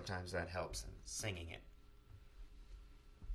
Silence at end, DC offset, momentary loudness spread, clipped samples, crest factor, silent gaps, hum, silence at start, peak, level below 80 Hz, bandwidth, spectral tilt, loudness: 0 s; under 0.1%; 21 LU; under 0.1%; 20 dB; none; none; 0 s; -28 dBFS; -58 dBFS; 15 kHz; -3.5 dB/octave; -46 LUFS